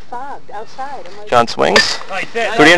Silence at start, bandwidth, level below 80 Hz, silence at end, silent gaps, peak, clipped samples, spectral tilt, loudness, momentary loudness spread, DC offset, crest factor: 0.1 s; 11 kHz; -48 dBFS; 0 s; none; 0 dBFS; 0.3%; -3 dB/octave; -13 LUFS; 19 LU; 7%; 16 dB